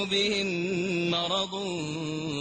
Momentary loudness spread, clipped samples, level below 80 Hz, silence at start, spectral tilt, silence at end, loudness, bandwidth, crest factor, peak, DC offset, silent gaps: 7 LU; under 0.1%; -62 dBFS; 0 s; -4 dB/octave; 0 s; -28 LUFS; 8.8 kHz; 14 dB; -14 dBFS; under 0.1%; none